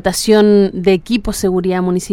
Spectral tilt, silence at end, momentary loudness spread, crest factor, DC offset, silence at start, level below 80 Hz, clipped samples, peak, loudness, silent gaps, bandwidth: -5.5 dB/octave; 0 s; 7 LU; 12 dB; under 0.1%; 0.05 s; -34 dBFS; under 0.1%; 0 dBFS; -13 LUFS; none; 17 kHz